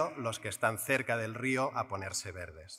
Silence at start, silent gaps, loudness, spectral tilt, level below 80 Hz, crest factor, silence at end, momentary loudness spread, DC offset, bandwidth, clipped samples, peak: 0 s; none; -34 LUFS; -4 dB/octave; -70 dBFS; 20 dB; 0 s; 7 LU; under 0.1%; 16 kHz; under 0.1%; -14 dBFS